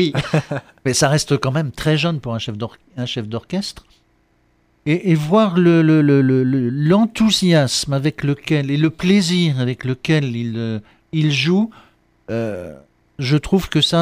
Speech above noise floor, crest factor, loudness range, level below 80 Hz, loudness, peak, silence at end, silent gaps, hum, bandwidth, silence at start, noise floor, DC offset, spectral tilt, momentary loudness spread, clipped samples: 43 dB; 14 dB; 7 LU; -46 dBFS; -17 LUFS; -2 dBFS; 0 s; none; none; 15.5 kHz; 0 s; -60 dBFS; under 0.1%; -5.5 dB/octave; 13 LU; under 0.1%